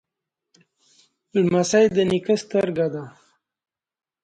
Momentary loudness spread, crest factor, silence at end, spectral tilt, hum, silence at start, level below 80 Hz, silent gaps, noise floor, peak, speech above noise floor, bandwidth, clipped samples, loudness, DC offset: 9 LU; 18 dB; 1.15 s; -5.5 dB/octave; none; 1.35 s; -60 dBFS; none; -84 dBFS; -6 dBFS; 64 dB; 10 kHz; under 0.1%; -21 LUFS; under 0.1%